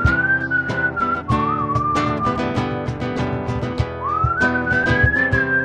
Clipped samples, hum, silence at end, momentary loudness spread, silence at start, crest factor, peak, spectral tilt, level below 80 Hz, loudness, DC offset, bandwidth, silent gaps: under 0.1%; none; 0 s; 8 LU; 0 s; 16 dB; -2 dBFS; -7 dB/octave; -34 dBFS; -19 LUFS; under 0.1%; 9.6 kHz; none